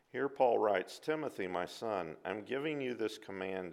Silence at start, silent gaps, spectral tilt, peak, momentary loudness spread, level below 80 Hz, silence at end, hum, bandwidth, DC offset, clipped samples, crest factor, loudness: 0.15 s; none; -5 dB/octave; -16 dBFS; 10 LU; -80 dBFS; 0 s; none; 15.5 kHz; under 0.1%; under 0.1%; 20 dB; -37 LUFS